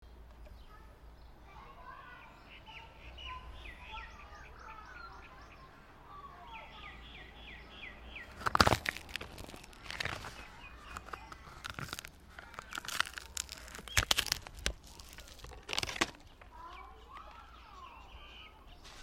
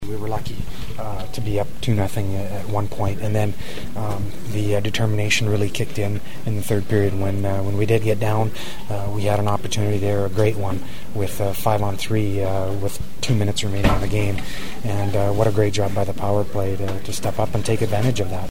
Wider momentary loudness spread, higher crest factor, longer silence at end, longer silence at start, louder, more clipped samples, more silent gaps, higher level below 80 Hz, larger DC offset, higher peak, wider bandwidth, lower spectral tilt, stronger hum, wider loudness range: first, 21 LU vs 9 LU; first, 36 dB vs 22 dB; about the same, 0 s vs 0 s; about the same, 0 s vs 0 s; second, -38 LUFS vs -23 LUFS; neither; neither; second, -54 dBFS vs -36 dBFS; second, under 0.1% vs 9%; second, -4 dBFS vs 0 dBFS; about the same, 16.5 kHz vs 16.5 kHz; second, -2.5 dB/octave vs -6 dB/octave; neither; first, 15 LU vs 3 LU